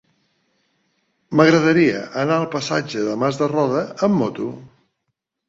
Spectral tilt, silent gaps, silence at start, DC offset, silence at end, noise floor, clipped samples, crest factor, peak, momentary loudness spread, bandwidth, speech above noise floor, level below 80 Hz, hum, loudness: -6 dB/octave; none; 1.3 s; under 0.1%; 0.85 s; -76 dBFS; under 0.1%; 20 dB; 0 dBFS; 10 LU; 7.8 kHz; 58 dB; -60 dBFS; none; -19 LUFS